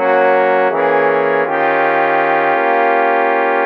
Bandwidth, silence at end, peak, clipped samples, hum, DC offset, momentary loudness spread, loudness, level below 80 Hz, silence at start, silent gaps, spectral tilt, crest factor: 5.6 kHz; 0 s; -2 dBFS; under 0.1%; none; under 0.1%; 2 LU; -13 LUFS; -74 dBFS; 0 s; none; -7 dB/octave; 12 dB